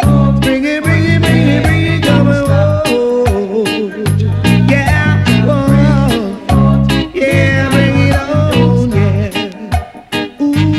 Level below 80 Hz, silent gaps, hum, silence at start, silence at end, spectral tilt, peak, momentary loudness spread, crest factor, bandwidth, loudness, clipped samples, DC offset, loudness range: -24 dBFS; none; none; 0 s; 0 s; -7 dB/octave; 0 dBFS; 6 LU; 10 dB; 13.5 kHz; -11 LUFS; under 0.1%; under 0.1%; 1 LU